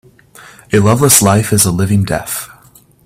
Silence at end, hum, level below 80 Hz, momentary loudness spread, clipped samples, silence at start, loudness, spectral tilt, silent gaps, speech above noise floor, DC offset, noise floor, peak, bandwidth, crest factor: 0.6 s; none; -42 dBFS; 14 LU; 0.1%; 0.7 s; -11 LUFS; -4.5 dB/octave; none; 34 dB; under 0.1%; -45 dBFS; 0 dBFS; 17 kHz; 14 dB